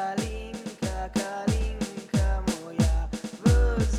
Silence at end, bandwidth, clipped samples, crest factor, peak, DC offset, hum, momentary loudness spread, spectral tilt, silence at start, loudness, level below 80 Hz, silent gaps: 0 s; 13.5 kHz; under 0.1%; 16 dB; -10 dBFS; under 0.1%; none; 11 LU; -6 dB/octave; 0 s; -28 LUFS; -30 dBFS; none